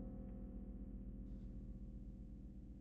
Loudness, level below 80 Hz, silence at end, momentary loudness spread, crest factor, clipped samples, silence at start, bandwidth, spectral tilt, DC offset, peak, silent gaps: -54 LUFS; -54 dBFS; 0 s; 4 LU; 12 dB; under 0.1%; 0 s; 2.7 kHz; -11.5 dB/octave; under 0.1%; -40 dBFS; none